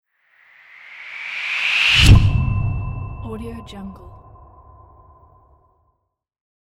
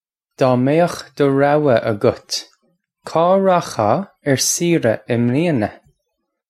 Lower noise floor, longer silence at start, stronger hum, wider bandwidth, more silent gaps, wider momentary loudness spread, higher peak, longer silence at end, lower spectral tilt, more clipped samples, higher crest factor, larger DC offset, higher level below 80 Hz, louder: about the same, -74 dBFS vs -74 dBFS; first, 0.85 s vs 0.4 s; neither; second, 14 kHz vs 15.5 kHz; neither; first, 24 LU vs 7 LU; about the same, -2 dBFS vs 0 dBFS; first, 2.5 s vs 0.75 s; about the same, -4.5 dB/octave vs -5 dB/octave; neither; about the same, 20 dB vs 16 dB; neither; first, -26 dBFS vs -56 dBFS; about the same, -16 LUFS vs -17 LUFS